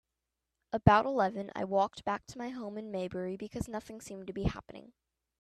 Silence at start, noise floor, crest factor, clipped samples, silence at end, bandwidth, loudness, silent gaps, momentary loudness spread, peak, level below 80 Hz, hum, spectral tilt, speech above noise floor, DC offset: 0.75 s; -87 dBFS; 28 dB; under 0.1%; 0.5 s; 14 kHz; -33 LUFS; none; 18 LU; -6 dBFS; -52 dBFS; none; -7 dB/octave; 55 dB; under 0.1%